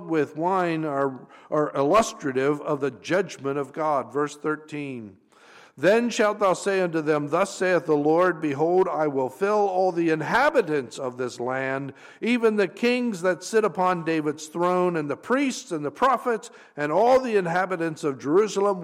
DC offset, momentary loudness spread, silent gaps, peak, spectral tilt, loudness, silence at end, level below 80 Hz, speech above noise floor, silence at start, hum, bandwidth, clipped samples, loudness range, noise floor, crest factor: under 0.1%; 9 LU; none; -10 dBFS; -5.5 dB/octave; -24 LUFS; 0 s; -64 dBFS; 28 dB; 0 s; none; 15 kHz; under 0.1%; 3 LU; -52 dBFS; 14 dB